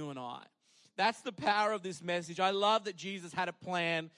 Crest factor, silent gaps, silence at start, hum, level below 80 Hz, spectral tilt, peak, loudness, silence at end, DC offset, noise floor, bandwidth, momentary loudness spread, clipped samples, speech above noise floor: 18 dB; none; 0 s; none; -82 dBFS; -4 dB/octave; -16 dBFS; -34 LUFS; 0.1 s; under 0.1%; -68 dBFS; 11.5 kHz; 13 LU; under 0.1%; 35 dB